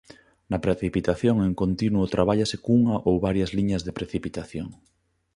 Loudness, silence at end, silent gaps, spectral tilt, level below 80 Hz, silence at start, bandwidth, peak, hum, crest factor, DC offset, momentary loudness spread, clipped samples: -24 LUFS; 0.6 s; none; -7 dB/octave; -44 dBFS; 0.5 s; 11 kHz; -4 dBFS; none; 20 dB; under 0.1%; 11 LU; under 0.1%